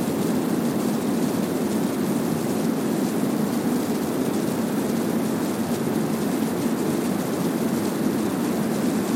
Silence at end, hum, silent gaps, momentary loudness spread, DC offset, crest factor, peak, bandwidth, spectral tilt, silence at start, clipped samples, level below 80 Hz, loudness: 0 s; none; none; 1 LU; under 0.1%; 14 dB; -10 dBFS; 17 kHz; -5.5 dB/octave; 0 s; under 0.1%; -60 dBFS; -24 LUFS